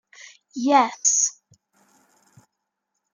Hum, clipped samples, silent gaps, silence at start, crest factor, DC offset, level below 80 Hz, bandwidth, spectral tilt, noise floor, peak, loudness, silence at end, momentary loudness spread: none; under 0.1%; none; 0.55 s; 22 dB; under 0.1%; -82 dBFS; 10.5 kHz; -0.5 dB/octave; -80 dBFS; -4 dBFS; -20 LUFS; 1.8 s; 10 LU